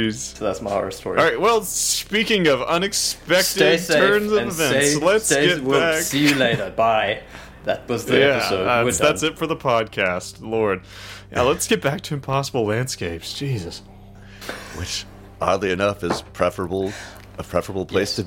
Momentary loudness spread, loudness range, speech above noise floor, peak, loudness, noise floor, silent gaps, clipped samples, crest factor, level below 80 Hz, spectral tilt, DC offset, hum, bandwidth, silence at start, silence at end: 12 LU; 8 LU; 21 dB; -2 dBFS; -20 LUFS; -42 dBFS; none; under 0.1%; 20 dB; -46 dBFS; -3.5 dB/octave; under 0.1%; none; 17 kHz; 0 s; 0 s